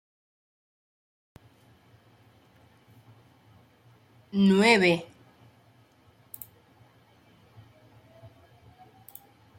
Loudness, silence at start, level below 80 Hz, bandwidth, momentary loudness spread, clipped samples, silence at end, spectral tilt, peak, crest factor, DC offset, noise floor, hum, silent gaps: -22 LUFS; 4.35 s; -72 dBFS; 16.5 kHz; 30 LU; under 0.1%; 4.55 s; -5.5 dB/octave; -8 dBFS; 24 dB; under 0.1%; -60 dBFS; none; none